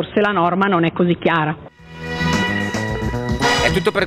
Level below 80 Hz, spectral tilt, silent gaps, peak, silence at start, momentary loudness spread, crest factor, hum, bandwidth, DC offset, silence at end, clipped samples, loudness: -36 dBFS; -5.5 dB/octave; none; 0 dBFS; 0 s; 7 LU; 18 dB; none; 15.5 kHz; under 0.1%; 0 s; under 0.1%; -18 LUFS